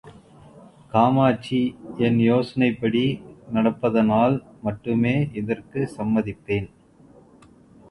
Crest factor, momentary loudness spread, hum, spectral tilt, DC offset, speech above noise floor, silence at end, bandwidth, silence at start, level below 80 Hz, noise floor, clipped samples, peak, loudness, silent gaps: 20 dB; 10 LU; none; -8.5 dB/octave; under 0.1%; 30 dB; 1.25 s; 11 kHz; 0.05 s; -54 dBFS; -51 dBFS; under 0.1%; -4 dBFS; -22 LUFS; none